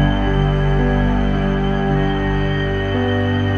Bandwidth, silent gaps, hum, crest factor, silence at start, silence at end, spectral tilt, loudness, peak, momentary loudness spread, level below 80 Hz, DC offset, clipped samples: 6.6 kHz; none; 50 Hz at -35 dBFS; 14 dB; 0 s; 0 s; -8 dB/octave; -18 LUFS; -2 dBFS; 2 LU; -22 dBFS; under 0.1%; under 0.1%